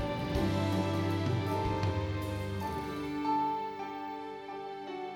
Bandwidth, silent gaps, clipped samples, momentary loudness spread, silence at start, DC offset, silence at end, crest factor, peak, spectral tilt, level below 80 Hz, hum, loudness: 17.5 kHz; none; under 0.1%; 10 LU; 0 s; under 0.1%; 0 s; 16 dB; -18 dBFS; -7 dB/octave; -50 dBFS; none; -34 LUFS